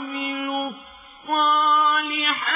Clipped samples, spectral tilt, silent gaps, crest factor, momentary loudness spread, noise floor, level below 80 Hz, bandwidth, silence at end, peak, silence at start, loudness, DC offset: under 0.1%; -5 dB/octave; none; 14 dB; 15 LU; -44 dBFS; -66 dBFS; 3.9 kHz; 0 s; -8 dBFS; 0 s; -20 LUFS; under 0.1%